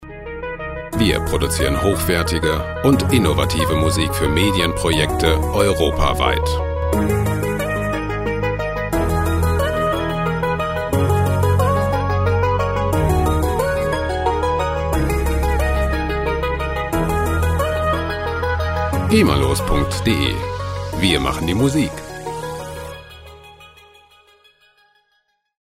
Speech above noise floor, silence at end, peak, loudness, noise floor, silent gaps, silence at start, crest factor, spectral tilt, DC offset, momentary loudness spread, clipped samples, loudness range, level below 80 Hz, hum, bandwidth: 49 dB; 1.95 s; 0 dBFS; -19 LUFS; -66 dBFS; none; 0 s; 18 dB; -5.5 dB/octave; under 0.1%; 8 LU; under 0.1%; 4 LU; -26 dBFS; none; 16 kHz